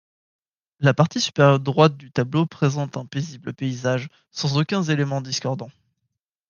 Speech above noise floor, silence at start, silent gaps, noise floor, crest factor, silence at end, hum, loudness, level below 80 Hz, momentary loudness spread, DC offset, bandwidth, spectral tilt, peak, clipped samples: 57 dB; 0.8 s; none; -79 dBFS; 20 dB; 0.8 s; none; -22 LUFS; -64 dBFS; 12 LU; under 0.1%; 7.2 kHz; -6 dB/octave; -2 dBFS; under 0.1%